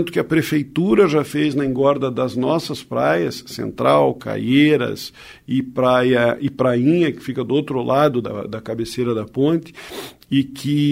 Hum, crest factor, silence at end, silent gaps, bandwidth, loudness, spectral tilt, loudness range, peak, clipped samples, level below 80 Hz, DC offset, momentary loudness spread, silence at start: none; 16 dB; 0 s; none; 16 kHz; -19 LUFS; -6.5 dB/octave; 3 LU; -2 dBFS; under 0.1%; -54 dBFS; under 0.1%; 12 LU; 0 s